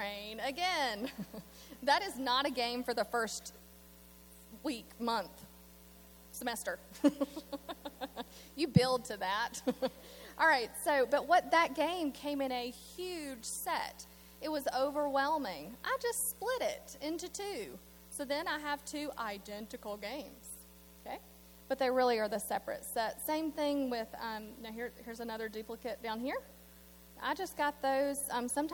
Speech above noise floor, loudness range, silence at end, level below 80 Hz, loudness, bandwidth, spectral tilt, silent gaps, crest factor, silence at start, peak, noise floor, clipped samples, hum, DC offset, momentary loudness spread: 22 dB; 9 LU; 0 s; -64 dBFS; -36 LUFS; 19.5 kHz; -4 dB/octave; none; 26 dB; 0 s; -12 dBFS; -57 dBFS; under 0.1%; none; under 0.1%; 20 LU